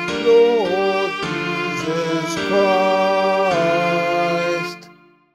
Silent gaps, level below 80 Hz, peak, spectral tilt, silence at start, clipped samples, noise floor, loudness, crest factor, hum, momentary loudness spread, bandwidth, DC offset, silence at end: none; -58 dBFS; -4 dBFS; -5 dB/octave; 0 s; under 0.1%; -48 dBFS; -18 LUFS; 14 dB; none; 7 LU; 14.5 kHz; under 0.1%; 0.45 s